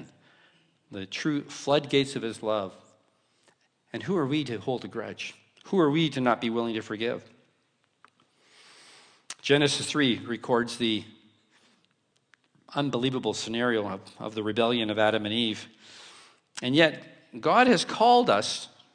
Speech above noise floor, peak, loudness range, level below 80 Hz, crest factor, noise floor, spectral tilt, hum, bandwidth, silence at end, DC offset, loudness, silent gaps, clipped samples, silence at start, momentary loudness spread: 45 dB; -6 dBFS; 6 LU; -70 dBFS; 24 dB; -71 dBFS; -4.5 dB/octave; none; 10.5 kHz; 0.3 s; under 0.1%; -26 LUFS; none; under 0.1%; 0 s; 16 LU